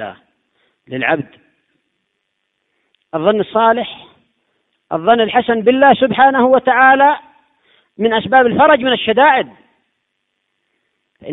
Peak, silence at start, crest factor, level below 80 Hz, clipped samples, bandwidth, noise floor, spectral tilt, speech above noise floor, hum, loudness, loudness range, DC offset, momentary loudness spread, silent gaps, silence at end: 0 dBFS; 0 s; 16 dB; -56 dBFS; under 0.1%; 4 kHz; -70 dBFS; -9 dB/octave; 58 dB; none; -12 LUFS; 8 LU; under 0.1%; 15 LU; none; 0 s